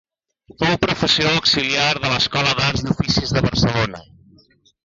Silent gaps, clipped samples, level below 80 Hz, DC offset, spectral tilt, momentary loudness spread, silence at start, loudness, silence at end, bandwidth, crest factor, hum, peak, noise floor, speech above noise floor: none; under 0.1%; -40 dBFS; under 0.1%; -4 dB/octave; 6 LU; 0.6 s; -17 LUFS; 0.85 s; 7.6 kHz; 16 dB; none; -4 dBFS; -54 dBFS; 36 dB